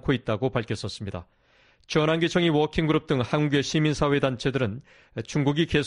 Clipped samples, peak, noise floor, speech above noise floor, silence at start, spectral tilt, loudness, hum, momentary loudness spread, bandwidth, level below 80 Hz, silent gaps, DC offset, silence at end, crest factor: under 0.1%; -8 dBFS; -60 dBFS; 36 dB; 0.05 s; -6 dB/octave; -25 LUFS; none; 13 LU; 11 kHz; -48 dBFS; none; under 0.1%; 0 s; 16 dB